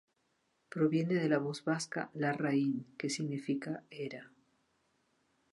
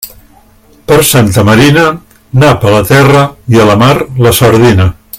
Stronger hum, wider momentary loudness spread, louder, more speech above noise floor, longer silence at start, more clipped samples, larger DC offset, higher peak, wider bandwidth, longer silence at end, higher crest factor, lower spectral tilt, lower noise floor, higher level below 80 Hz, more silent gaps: neither; first, 12 LU vs 6 LU; second, -35 LUFS vs -6 LUFS; first, 44 dB vs 36 dB; first, 0.75 s vs 0 s; second, under 0.1% vs 3%; neither; second, -16 dBFS vs 0 dBFS; second, 11.5 kHz vs 17 kHz; first, 1.25 s vs 0 s; first, 20 dB vs 6 dB; about the same, -6 dB/octave vs -5.5 dB/octave; first, -78 dBFS vs -41 dBFS; second, -82 dBFS vs -32 dBFS; neither